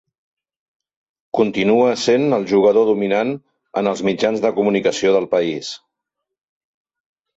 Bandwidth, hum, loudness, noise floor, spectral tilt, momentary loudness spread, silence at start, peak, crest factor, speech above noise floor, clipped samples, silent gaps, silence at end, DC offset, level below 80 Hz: 8 kHz; none; -17 LUFS; -81 dBFS; -5 dB/octave; 11 LU; 1.35 s; -4 dBFS; 16 dB; 64 dB; under 0.1%; none; 1.6 s; under 0.1%; -60 dBFS